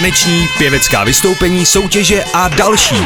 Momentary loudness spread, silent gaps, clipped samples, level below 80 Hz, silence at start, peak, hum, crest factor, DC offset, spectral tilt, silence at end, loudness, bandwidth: 2 LU; none; under 0.1%; -28 dBFS; 0 s; 0 dBFS; none; 10 dB; 0.4%; -3 dB/octave; 0 s; -10 LUFS; 19 kHz